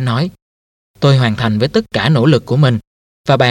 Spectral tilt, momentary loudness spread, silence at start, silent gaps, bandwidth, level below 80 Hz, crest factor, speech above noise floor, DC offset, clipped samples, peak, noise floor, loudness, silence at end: -7 dB/octave; 8 LU; 0 s; 0.42-0.94 s, 2.87-3.24 s; 10.5 kHz; -46 dBFS; 14 dB; over 78 dB; under 0.1%; under 0.1%; 0 dBFS; under -90 dBFS; -14 LUFS; 0 s